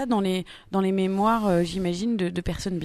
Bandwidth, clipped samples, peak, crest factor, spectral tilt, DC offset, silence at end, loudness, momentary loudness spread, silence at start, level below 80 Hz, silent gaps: 13.5 kHz; under 0.1%; -10 dBFS; 14 dB; -6.5 dB/octave; under 0.1%; 0 s; -25 LUFS; 7 LU; 0 s; -46 dBFS; none